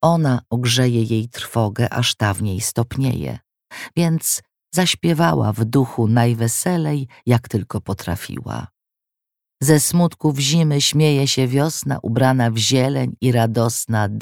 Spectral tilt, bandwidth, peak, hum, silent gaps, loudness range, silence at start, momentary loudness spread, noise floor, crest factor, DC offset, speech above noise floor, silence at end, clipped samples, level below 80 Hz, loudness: -5 dB/octave; 17.5 kHz; 0 dBFS; none; none; 4 LU; 0 s; 10 LU; -84 dBFS; 18 dB; under 0.1%; 66 dB; 0 s; under 0.1%; -50 dBFS; -18 LUFS